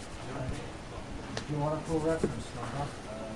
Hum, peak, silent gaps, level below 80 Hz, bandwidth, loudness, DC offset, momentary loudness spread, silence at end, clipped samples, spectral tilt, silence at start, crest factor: none; -16 dBFS; none; -48 dBFS; 11.5 kHz; -36 LUFS; 0.3%; 11 LU; 0 s; under 0.1%; -6 dB/octave; 0 s; 20 dB